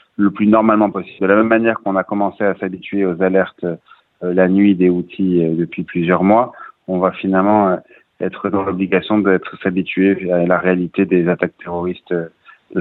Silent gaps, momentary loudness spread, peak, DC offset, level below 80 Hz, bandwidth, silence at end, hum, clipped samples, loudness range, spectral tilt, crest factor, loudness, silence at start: none; 11 LU; 0 dBFS; under 0.1%; -56 dBFS; 4.1 kHz; 0 s; none; under 0.1%; 2 LU; -10.5 dB/octave; 16 dB; -16 LUFS; 0.2 s